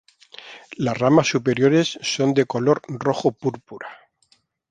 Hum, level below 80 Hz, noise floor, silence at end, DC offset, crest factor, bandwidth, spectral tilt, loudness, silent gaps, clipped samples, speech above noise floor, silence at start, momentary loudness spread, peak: none; -62 dBFS; -63 dBFS; 0.75 s; under 0.1%; 20 dB; 9.4 kHz; -5.5 dB/octave; -20 LUFS; none; under 0.1%; 43 dB; 0.45 s; 21 LU; -2 dBFS